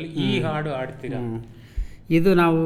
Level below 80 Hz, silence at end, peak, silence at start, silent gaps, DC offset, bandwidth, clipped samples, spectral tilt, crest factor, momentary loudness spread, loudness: -38 dBFS; 0 s; -8 dBFS; 0 s; none; under 0.1%; 14.5 kHz; under 0.1%; -7.5 dB/octave; 14 dB; 18 LU; -23 LUFS